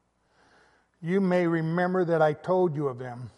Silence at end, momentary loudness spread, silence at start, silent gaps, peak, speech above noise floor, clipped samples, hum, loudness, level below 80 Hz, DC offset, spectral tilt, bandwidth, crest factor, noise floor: 0.1 s; 8 LU; 1 s; none; -10 dBFS; 40 dB; under 0.1%; none; -26 LUFS; -72 dBFS; under 0.1%; -8.5 dB/octave; 10.5 kHz; 16 dB; -65 dBFS